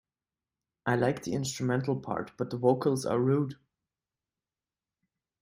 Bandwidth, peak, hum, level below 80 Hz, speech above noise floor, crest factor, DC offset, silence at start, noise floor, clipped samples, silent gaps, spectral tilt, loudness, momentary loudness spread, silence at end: 16 kHz; -10 dBFS; none; -68 dBFS; over 61 dB; 22 dB; under 0.1%; 0.85 s; under -90 dBFS; under 0.1%; none; -6 dB/octave; -30 LUFS; 9 LU; 1.85 s